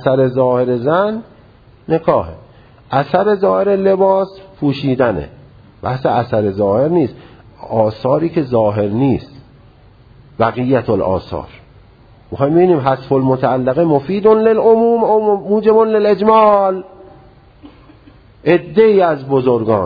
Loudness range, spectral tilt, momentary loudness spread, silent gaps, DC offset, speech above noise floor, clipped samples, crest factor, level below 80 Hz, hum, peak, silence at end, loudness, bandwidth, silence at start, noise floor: 6 LU; -10 dB/octave; 10 LU; none; under 0.1%; 31 dB; under 0.1%; 14 dB; -46 dBFS; none; 0 dBFS; 0 s; -14 LUFS; 5 kHz; 0 s; -44 dBFS